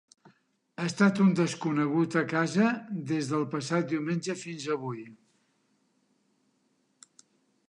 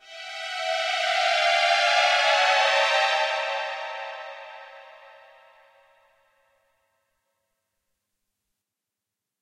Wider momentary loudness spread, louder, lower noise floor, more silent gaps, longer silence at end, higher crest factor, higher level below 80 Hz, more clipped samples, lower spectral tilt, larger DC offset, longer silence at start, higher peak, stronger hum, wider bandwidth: second, 11 LU vs 18 LU; second, -28 LUFS vs -22 LUFS; second, -72 dBFS vs -87 dBFS; neither; second, 2.55 s vs 4.3 s; about the same, 18 dB vs 18 dB; first, -78 dBFS vs -84 dBFS; neither; first, -6 dB/octave vs 3.5 dB/octave; neither; first, 0.8 s vs 0.05 s; about the same, -12 dBFS vs -10 dBFS; neither; second, 11 kHz vs 15 kHz